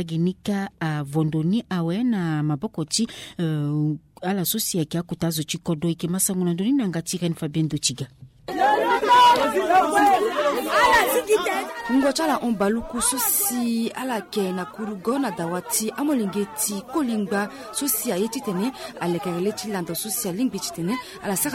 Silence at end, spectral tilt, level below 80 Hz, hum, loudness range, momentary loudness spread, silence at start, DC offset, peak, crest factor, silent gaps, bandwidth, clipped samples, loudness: 0 s; -4 dB/octave; -54 dBFS; none; 7 LU; 10 LU; 0 s; under 0.1%; -6 dBFS; 16 dB; none; 16.5 kHz; under 0.1%; -23 LUFS